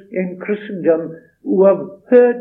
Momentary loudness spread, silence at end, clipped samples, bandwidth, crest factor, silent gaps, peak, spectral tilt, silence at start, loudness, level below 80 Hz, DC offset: 12 LU; 0 s; under 0.1%; 3.8 kHz; 14 dB; none; 0 dBFS; -11 dB/octave; 0.1 s; -16 LUFS; -72 dBFS; under 0.1%